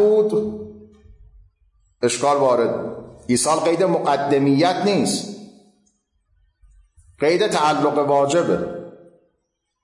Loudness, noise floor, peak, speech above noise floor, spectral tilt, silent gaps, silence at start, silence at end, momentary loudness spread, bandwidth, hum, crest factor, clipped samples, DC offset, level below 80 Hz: -19 LUFS; -74 dBFS; -6 dBFS; 56 dB; -4.5 dB/octave; none; 0 s; 0.95 s; 17 LU; 11.5 kHz; none; 14 dB; under 0.1%; under 0.1%; -56 dBFS